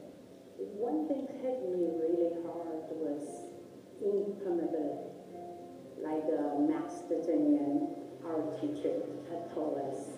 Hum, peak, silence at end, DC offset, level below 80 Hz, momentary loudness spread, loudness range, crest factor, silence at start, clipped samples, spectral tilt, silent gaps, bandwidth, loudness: none; -20 dBFS; 0 s; under 0.1%; -82 dBFS; 16 LU; 4 LU; 16 dB; 0 s; under 0.1%; -7.5 dB/octave; none; 11.5 kHz; -35 LUFS